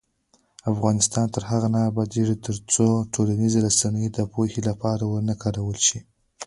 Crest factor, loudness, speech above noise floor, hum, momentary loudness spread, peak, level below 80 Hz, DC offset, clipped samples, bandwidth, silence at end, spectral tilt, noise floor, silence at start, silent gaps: 18 dB; -23 LUFS; 42 dB; none; 7 LU; -6 dBFS; -50 dBFS; under 0.1%; under 0.1%; 11.5 kHz; 0 s; -5 dB/octave; -65 dBFS; 0.65 s; none